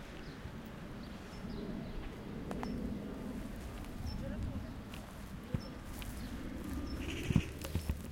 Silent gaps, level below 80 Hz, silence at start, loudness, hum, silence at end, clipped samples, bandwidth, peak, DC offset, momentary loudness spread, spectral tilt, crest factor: none; -48 dBFS; 0 s; -43 LUFS; none; 0 s; under 0.1%; 17 kHz; -16 dBFS; under 0.1%; 8 LU; -6 dB/octave; 26 dB